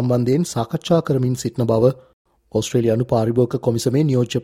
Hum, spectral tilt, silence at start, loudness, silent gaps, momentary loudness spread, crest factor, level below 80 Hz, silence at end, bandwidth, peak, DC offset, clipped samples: none; -7 dB/octave; 0 s; -19 LUFS; 2.13-2.25 s; 5 LU; 16 dB; -52 dBFS; 0 s; 15.5 kHz; -2 dBFS; under 0.1%; under 0.1%